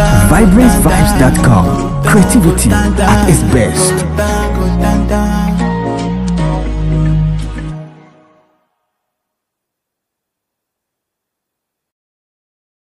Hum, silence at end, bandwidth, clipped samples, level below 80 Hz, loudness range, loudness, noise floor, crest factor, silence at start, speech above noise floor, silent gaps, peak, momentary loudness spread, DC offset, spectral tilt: none; 4.95 s; 15.5 kHz; 0.3%; -18 dBFS; 11 LU; -11 LUFS; -77 dBFS; 12 dB; 0 s; 69 dB; none; 0 dBFS; 9 LU; under 0.1%; -6 dB/octave